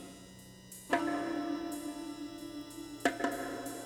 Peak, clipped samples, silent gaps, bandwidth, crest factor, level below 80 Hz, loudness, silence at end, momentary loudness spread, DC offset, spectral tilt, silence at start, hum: -16 dBFS; under 0.1%; none; 19 kHz; 22 dB; -66 dBFS; -37 LUFS; 0 s; 17 LU; under 0.1%; -3.5 dB/octave; 0 s; none